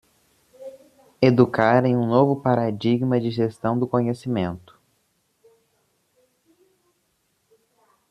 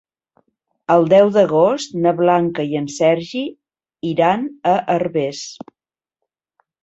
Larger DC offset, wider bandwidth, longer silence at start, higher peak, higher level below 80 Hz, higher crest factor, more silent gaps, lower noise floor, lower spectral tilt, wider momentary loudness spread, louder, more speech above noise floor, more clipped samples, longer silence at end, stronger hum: neither; first, 10 kHz vs 8.2 kHz; second, 0.6 s vs 0.9 s; about the same, -2 dBFS vs -2 dBFS; about the same, -62 dBFS vs -62 dBFS; first, 22 dB vs 16 dB; neither; second, -70 dBFS vs -88 dBFS; first, -8.5 dB/octave vs -6 dB/octave; first, 22 LU vs 16 LU; second, -21 LUFS vs -17 LUFS; second, 50 dB vs 72 dB; neither; first, 3.5 s vs 1.3 s; neither